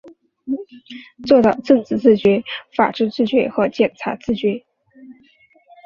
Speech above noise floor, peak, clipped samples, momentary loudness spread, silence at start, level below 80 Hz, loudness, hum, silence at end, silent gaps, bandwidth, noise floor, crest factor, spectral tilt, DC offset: 37 dB; -2 dBFS; under 0.1%; 17 LU; 0.05 s; -54 dBFS; -18 LUFS; none; 0.75 s; none; 7.2 kHz; -54 dBFS; 18 dB; -7 dB/octave; under 0.1%